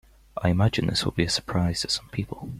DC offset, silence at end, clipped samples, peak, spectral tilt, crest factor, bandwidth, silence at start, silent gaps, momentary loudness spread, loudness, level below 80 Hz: under 0.1%; 0 s; under 0.1%; -8 dBFS; -5 dB/octave; 18 dB; 15 kHz; 0.35 s; none; 9 LU; -25 LUFS; -46 dBFS